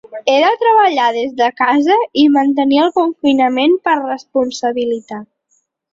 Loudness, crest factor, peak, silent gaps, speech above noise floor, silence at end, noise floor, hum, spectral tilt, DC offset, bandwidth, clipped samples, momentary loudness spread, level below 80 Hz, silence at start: -13 LUFS; 14 dB; 0 dBFS; none; 49 dB; 0.7 s; -62 dBFS; none; -3.5 dB/octave; under 0.1%; 7.6 kHz; under 0.1%; 8 LU; -60 dBFS; 0.1 s